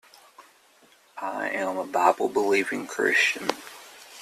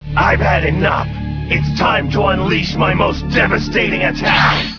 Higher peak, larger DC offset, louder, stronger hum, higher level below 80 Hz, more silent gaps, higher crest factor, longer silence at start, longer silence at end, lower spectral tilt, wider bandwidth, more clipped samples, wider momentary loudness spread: second, -6 dBFS vs 0 dBFS; neither; second, -25 LUFS vs -14 LUFS; neither; second, -72 dBFS vs -26 dBFS; neither; first, 22 dB vs 14 dB; first, 0.4 s vs 0 s; about the same, 0 s vs 0 s; second, -2.5 dB/octave vs -6 dB/octave; first, 14.5 kHz vs 5.4 kHz; neither; first, 22 LU vs 5 LU